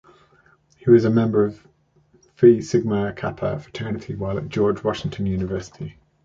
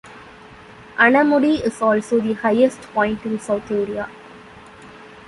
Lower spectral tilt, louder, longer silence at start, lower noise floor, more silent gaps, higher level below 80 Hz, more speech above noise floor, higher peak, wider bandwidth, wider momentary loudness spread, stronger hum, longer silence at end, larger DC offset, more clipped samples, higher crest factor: first, -8 dB/octave vs -5.5 dB/octave; second, -21 LUFS vs -18 LUFS; first, 0.85 s vs 0.05 s; first, -59 dBFS vs -42 dBFS; neither; first, -48 dBFS vs -54 dBFS; first, 39 dB vs 24 dB; about the same, -2 dBFS vs -2 dBFS; second, 7.6 kHz vs 11.5 kHz; first, 14 LU vs 11 LU; neither; first, 0.35 s vs 0.1 s; neither; neither; about the same, 18 dB vs 18 dB